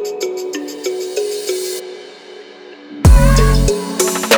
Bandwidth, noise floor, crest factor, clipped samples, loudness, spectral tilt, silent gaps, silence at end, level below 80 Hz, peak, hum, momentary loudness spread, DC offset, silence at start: over 20 kHz; -36 dBFS; 14 dB; under 0.1%; -16 LUFS; -4.5 dB/octave; none; 0 s; -18 dBFS; 0 dBFS; none; 25 LU; under 0.1%; 0 s